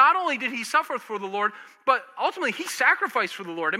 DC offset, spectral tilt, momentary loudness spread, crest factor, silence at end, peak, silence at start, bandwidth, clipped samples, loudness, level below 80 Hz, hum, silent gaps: under 0.1%; -2 dB/octave; 9 LU; 20 dB; 0 s; -6 dBFS; 0 s; 16.5 kHz; under 0.1%; -25 LUFS; under -90 dBFS; none; none